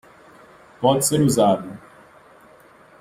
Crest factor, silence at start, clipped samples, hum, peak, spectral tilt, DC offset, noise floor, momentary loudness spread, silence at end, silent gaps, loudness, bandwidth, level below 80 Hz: 18 dB; 0.8 s; under 0.1%; none; -4 dBFS; -5 dB/octave; under 0.1%; -50 dBFS; 18 LU; 1.25 s; none; -19 LUFS; 16 kHz; -56 dBFS